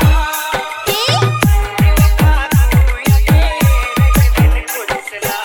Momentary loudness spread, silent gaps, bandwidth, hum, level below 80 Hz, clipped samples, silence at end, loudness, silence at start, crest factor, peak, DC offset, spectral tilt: 8 LU; none; over 20 kHz; none; -14 dBFS; under 0.1%; 0 s; -13 LUFS; 0 s; 12 dB; 0 dBFS; under 0.1%; -5 dB/octave